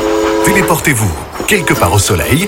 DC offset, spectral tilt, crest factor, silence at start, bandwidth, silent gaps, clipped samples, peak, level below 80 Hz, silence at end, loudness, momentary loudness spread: under 0.1%; -4 dB/octave; 12 dB; 0 s; 17.5 kHz; none; under 0.1%; 0 dBFS; -30 dBFS; 0 s; -11 LUFS; 4 LU